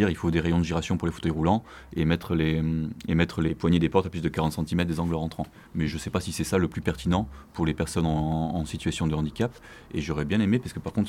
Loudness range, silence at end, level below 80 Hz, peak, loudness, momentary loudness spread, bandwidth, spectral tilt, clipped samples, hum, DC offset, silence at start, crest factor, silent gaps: 3 LU; 0 s; -42 dBFS; -6 dBFS; -27 LUFS; 7 LU; 14.5 kHz; -6.5 dB/octave; under 0.1%; none; under 0.1%; 0 s; 20 dB; none